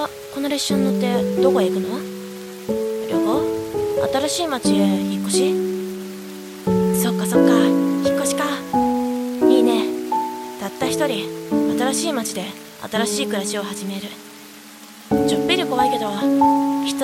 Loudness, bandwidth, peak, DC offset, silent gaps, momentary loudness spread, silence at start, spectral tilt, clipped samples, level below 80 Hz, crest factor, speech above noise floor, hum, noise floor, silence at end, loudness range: -20 LUFS; 16.5 kHz; -2 dBFS; under 0.1%; none; 15 LU; 0 s; -4.5 dB/octave; under 0.1%; -54 dBFS; 16 dB; 22 dB; none; -41 dBFS; 0 s; 5 LU